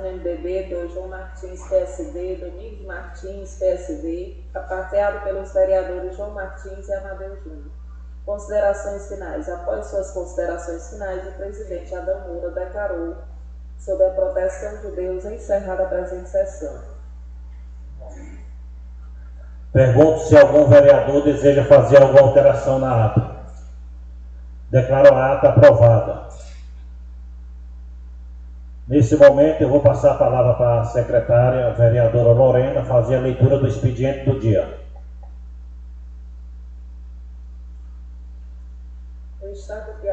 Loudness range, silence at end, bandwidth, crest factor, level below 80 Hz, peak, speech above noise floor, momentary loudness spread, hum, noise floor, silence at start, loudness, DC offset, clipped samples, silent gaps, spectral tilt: 15 LU; 0 s; 8.2 kHz; 18 dB; -36 dBFS; 0 dBFS; 19 dB; 25 LU; 60 Hz at -35 dBFS; -36 dBFS; 0 s; -16 LUFS; under 0.1%; under 0.1%; none; -8 dB/octave